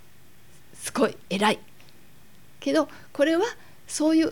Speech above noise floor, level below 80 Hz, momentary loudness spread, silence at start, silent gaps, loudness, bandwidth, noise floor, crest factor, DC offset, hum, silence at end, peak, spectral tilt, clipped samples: 32 dB; -66 dBFS; 11 LU; 0.8 s; none; -26 LUFS; 18 kHz; -56 dBFS; 18 dB; 0.5%; none; 0 s; -8 dBFS; -4 dB/octave; under 0.1%